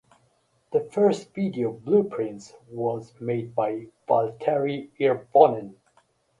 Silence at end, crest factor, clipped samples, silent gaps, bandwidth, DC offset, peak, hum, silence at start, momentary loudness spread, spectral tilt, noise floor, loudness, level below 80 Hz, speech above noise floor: 0.7 s; 24 dB; under 0.1%; none; 10.5 kHz; under 0.1%; 0 dBFS; none; 0.7 s; 13 LU; -7.5 dB/octave; -67 dBFS; -25 LUFS; -68 dBFS; 42 dB